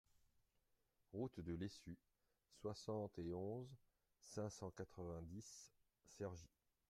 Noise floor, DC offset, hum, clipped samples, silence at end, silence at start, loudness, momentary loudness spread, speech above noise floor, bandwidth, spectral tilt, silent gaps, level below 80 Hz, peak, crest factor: -85 dBFS; under 0.1%; none; under 0.1%; 0.45 s; 1.1 s; -52 LUFS; 13 LU; 34 dB; 15.5 kHz; -6 dB/octave; none; -74 dBFS; -36 dBFS; 18 dB